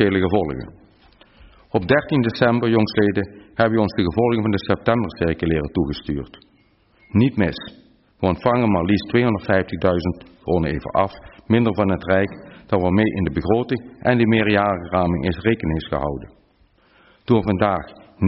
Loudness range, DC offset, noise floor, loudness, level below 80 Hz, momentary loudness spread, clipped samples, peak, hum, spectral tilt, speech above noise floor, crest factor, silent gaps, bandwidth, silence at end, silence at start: 3 LU; under 0.1%; -58 dBFS; -20 LUFS; -42 dBFS; 10 LU; under 0.1%; -4 dBFS; none; -6 dB/octave; 39 dB; 16 dB; none; 5.8 kHz; 0 s; 0 s